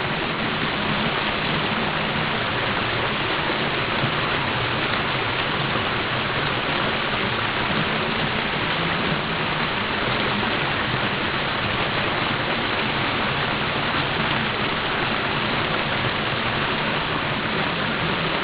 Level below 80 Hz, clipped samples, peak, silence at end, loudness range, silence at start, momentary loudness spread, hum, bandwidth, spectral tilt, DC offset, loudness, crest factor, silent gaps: -44 dBFS; under 0.1%; -8 dBFS; 0 s; 0 LU; 0 s; 1 LU; none; 4 kHz; -2 dB/octave; under 0.1%; -22 LUFS; 16 dB; none